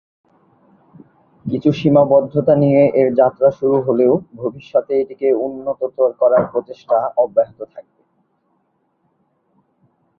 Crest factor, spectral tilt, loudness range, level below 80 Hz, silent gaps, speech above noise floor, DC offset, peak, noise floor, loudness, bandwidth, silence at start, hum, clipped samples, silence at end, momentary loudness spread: 16 dB; -9.5 dB/octave; 8 LU; -58 dBFS; none; 50 dB; under 0.1%; -2 dBFS; -65 dBFS; -16 LUFS; 6.4 kHz; 1.45 s; none; under 0.1%; 2.35 s; 12 LU